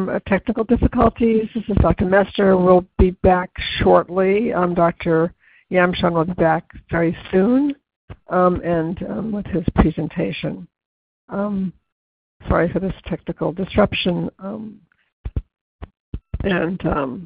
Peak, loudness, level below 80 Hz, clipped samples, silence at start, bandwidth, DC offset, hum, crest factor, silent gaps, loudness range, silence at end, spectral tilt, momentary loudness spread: 0 dBFS; -19 LUFS; -32 dBFS; under 0.1%; 0 s; 5 kHz; under 0.1%; none; 18 dB; 7.96-8.08 s, 10.85-11.28 s, 11.92-12.40 s, 15.13-15.24 s, 15.61-15.79 s, 16.00-16.13 s; 8 LU; 0 s; -11.5 dB/octave; 14 LU